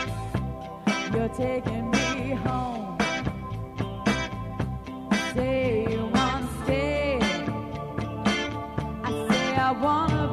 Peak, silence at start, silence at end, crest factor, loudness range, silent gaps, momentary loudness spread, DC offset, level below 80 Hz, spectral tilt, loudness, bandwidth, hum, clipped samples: -8 dBFS; 0 s; 0 s; 18 dB; 2 LU; none; 9 LU; under 0.1%; -42 dBFS; -5.5 dB/octave; -27 LUFS; 14 kHz; none; under 0.1%